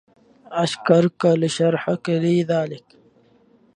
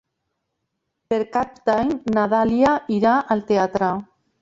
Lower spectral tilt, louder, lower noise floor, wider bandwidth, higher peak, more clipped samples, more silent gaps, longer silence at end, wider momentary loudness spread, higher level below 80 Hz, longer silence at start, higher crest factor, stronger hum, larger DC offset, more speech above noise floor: about the same, -6.5 dB/octave vs -7 dB/octave; about the same, -20 LUFS vs -20 LUFS; second, -56 dBFS vs -77 dBFS; first, 10.5 kHz vs 7.8 kHz; about the same, -2 dBFS vs -4 dBFS; neither; neither; first, 0.95 s vs 0.4 s; first, 10 LU vs 7 LU; second, -66 dBFS vs -52 dBFS; second, 0.5 s vs 1.1 s; about the same, 20 dB vs 16 dB; neither; neither; second, 37 dB vs 57 dB